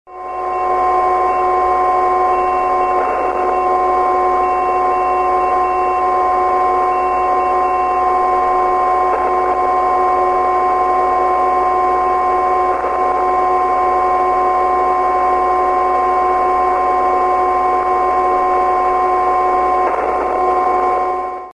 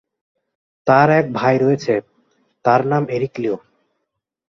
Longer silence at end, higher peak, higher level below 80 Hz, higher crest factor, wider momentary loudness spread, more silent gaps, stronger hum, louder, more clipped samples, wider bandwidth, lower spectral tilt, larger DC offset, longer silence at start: second, 0.1 s vs 0.9 s; about the same, -2 dBFS vs -2 dBFS; first, -40 dBFS vs -60 dBFS; second, 12 dB vs 18 dB; second, 2 LU vs 11 LU; neither; neither; about the same, -15 LUFS vs -17 LUFS; neither; first, 10.5 kHz vs 7.4 kHz; second, -6 dB/octave vs -7.5 dB/octave; neither; second, 0.05 s vs 0.85 s